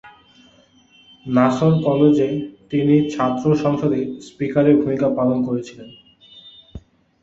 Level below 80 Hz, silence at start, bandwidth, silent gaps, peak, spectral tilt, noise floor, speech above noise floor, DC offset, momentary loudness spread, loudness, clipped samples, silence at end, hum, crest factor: -52 dBFS; 0.05 s; 7.8 kHz; none; -2 dBFS; -8 dB/octave; -53 dBFS; 36 dB; under 0.1%; 12 LU; -18 LUFS; under 0.1%; 0.45 s; none; 18 dB